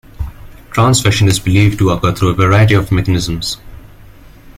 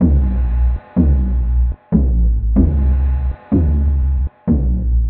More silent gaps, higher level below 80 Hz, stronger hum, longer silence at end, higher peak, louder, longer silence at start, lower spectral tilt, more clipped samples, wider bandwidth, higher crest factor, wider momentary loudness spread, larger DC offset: neither; second, -30 dBFS vs -16 dBFS; neither; about the same, 0.05 s vs 0 s; about the same, 0 dBFS vs 0 dBFS; first, -12 LUFS vs -17 LUFS; first, 0.2 s vs 0 s; second, -5.5 dB/octave vs -12.5 dB/octave; neither; first, 16 kHz vs 2.6 kHz; about the same, 12 dB vs 14 dB; first, 14 LU vs 4 LU; neither